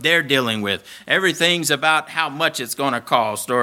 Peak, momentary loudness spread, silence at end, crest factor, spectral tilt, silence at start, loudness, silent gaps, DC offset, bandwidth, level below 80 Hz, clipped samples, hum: 0 dBFS; 7 LU; 0 s; 18 dB; -2.5 dB/octave; 0 s; -19 LUFS; none; under 0.1%; 19 kHz; -68 dBFS; under 0.1%; none